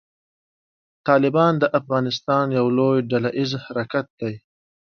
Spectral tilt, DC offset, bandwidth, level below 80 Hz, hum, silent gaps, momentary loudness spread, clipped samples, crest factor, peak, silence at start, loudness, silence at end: -7 dB/octave; under 0.1%; 6.8 kHz; -64 dBFS; none; 4.10-4.18 s; 12 LU; under 0.1%; 20 dB; -2 dBFS; 1.05 s; -21 LUFS; 0.6 s